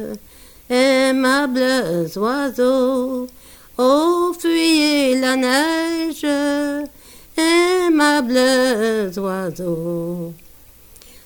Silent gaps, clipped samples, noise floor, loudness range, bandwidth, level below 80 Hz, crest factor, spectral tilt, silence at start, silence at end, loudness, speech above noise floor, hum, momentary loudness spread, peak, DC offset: none; under 0.1%; -45 dBFS; 1 LU; 19.5 kHz; -52 dBFS; 14 dB; -4 dB/octave; 0 s; 0.9 s; -17 LUFS; 27 dB; none; 12 LU; -4 dBFS; under 0.1%